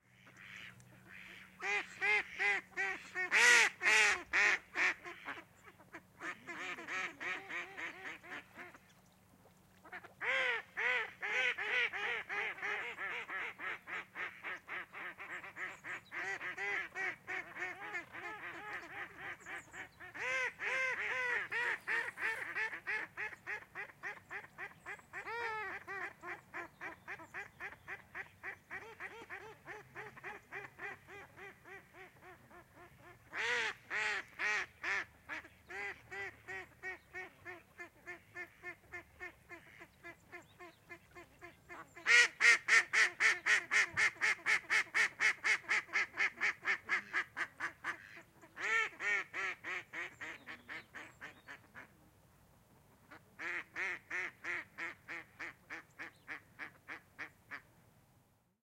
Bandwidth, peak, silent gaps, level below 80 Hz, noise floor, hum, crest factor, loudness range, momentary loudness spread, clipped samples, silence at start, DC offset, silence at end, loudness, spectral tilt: 16.5 kHz; -14 dBFS; none; -78 dBFS; -72 dBFS; none; 26 dB; 19 LU; 22 LU; under 0.1%; 0.25 s; under 0.1%; 1 s; -36 LUFS; -0.5 dB/octave